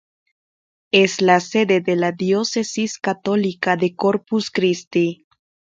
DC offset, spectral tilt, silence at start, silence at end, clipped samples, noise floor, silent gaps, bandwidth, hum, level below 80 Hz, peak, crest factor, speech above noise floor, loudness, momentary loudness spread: under 0.1%; -4.5 dB/octave; 0.95 s; 0.55 s; under 0.1%; under -90 dBFS; 4.87-4.91 s; 9 kHz; none; -64 dBFS; -2 dBFS; 18 dB; over 72 dB; -19 LUFS; 7 LU